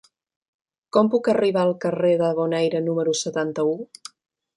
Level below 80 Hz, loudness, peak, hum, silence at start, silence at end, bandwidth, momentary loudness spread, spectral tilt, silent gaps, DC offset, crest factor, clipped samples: -70 dBFS; -22 LUFS; -4 dBFS; none; 0.95 s; 0.75 s; 11.5 kHz; 10 LU; -5.5 dB/octave; none; under 0.1%; 18 dB; under 0.1%